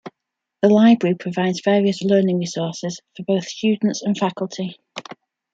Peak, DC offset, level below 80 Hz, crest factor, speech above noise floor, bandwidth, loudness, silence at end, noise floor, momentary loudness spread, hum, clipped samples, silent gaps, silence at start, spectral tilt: -2 dBFS; under 0.1%; -66 dBFS; 18 dB; 62 dB; 7.8 kHz; -19 LUFS; 0.4 s; -81 dBFS; 16 LU; none; under 0.1%; none; 0.05 s; -6 dB/octave